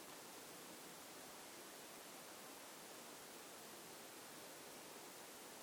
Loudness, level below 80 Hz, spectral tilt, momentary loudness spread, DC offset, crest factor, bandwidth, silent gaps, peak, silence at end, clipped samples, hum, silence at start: -55 LUFS; under -90 dBFS; -1.5 dB/octave; 0 LU; under 0.1%; 14 dB; over 20 kHz; none; -42 dBFS; 0 s; under 0.1%; none; 0 s